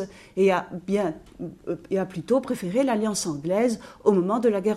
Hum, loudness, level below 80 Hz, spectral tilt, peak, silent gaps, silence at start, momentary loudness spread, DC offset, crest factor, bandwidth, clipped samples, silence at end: none; -25 LUFS; -58 dBFS; -5.5 dB/octave; -6 dBFS; none; 0 s; 11 LU; under 0.1%; 18 dB; 13.5 kHz; under 0.1%; 0 s